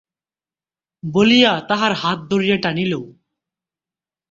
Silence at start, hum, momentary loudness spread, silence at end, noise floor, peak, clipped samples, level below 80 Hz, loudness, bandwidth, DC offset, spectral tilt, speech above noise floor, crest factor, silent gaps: 1.05 s; none; 11 LU; 1.2 s; under -90 dBFS; 0 dBFS; under 0.1%; -58 dBFS; -17 LUFS; 7.6 kHz; under 0.1%; -5.5 dB/octave; over 73 dB; 20 dB; none